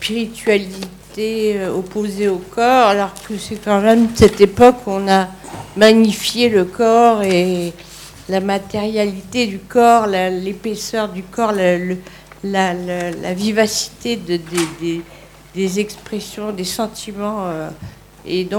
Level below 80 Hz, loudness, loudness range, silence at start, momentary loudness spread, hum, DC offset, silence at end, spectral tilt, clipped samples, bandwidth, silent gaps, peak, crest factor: -44 dBFS; -16 LUFS; 9 LU; 0 s; 16 LU; none; under 0.1%; 0 s; -4.5 dB/octave; 0.1%; 19 kHz; none; 0 dBFS; 16 dB